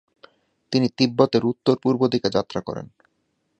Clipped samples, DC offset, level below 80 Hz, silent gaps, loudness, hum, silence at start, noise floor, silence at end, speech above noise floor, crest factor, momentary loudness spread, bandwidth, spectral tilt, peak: under 0.1%; under 0.1%; -60 dBFS; none; -21 LUFS; none; 0.7 s; -71 dBFS; 0.75 s; 50 dB; 22 dB; 11 LU; 8.2 kHz; -6.5 dB/octave; -2 dBFS